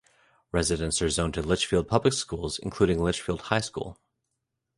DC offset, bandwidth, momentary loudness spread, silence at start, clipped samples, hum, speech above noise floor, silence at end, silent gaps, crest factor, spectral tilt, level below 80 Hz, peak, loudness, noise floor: under 0.1%; 11.5 kHz; 8 LU; 0.55 s; under 0.1%; none; 55 dB; 0.85 s; none; 22 dB; -4.5 dB/octave; -42 dBFS; -6 dBFS; -27 LUFS; -82 dBFS